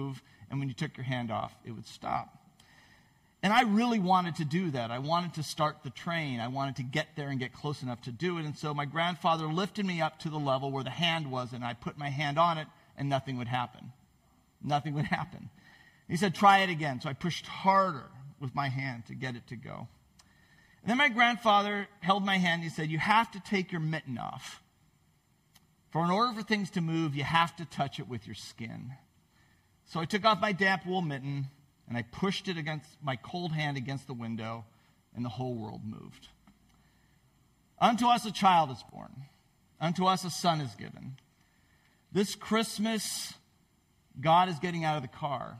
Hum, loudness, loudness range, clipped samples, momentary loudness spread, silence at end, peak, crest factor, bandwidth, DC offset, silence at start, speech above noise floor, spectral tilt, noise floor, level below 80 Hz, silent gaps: none; -31 LUFS; 7 LU; under 0.1%; 17 LU; 0 s; -10 dBFS; 22 dB; 15.5 kHz; under 0.1%; 0 s; 38 dB; -5 dB/octave; -69 dBFS; -68 dBFS; none